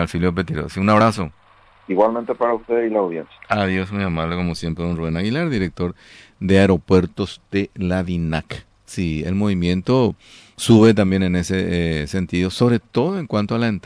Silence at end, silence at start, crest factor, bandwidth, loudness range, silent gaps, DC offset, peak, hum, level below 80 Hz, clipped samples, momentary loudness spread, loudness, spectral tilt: 0.05 s; 0 s; 16 dB; 11 kHz; 4 LU; none; under 0.1%; -4 dBFS; none; -42 dBFS; under 0.1%; 11 LU; -19 LUFS; -6.5 dB/octave